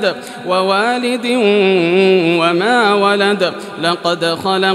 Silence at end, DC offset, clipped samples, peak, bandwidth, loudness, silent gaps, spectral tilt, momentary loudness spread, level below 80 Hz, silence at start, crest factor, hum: 0 s; under 0.1%; under 0.1%; 0 dBFS; 13.5 kHz; -13 LUFS; none; -5 dB/octave; 7 LU; -66 dBFS; 0 s; 12 dB; none